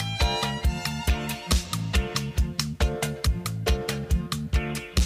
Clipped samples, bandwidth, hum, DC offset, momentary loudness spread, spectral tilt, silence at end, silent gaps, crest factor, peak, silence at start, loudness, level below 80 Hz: under 0.1%; 16 kHz; none; under 0.1%; 3 LU; -4.5 dB/octave; 0 s; none; 16 dB; -10 dBFS; 0 s; -27 LUFS; -28 dBFS